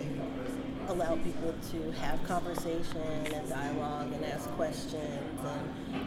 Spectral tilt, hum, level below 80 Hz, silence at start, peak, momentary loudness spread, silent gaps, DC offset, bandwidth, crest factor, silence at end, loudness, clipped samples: -5.5 dB/octave; none; -46 dBFS; 0 s; -18 dBFS; 4 LU; none; under 0.1%; 16 kHz; 16 dB; 0 s; -36 LUFS; under 0.1%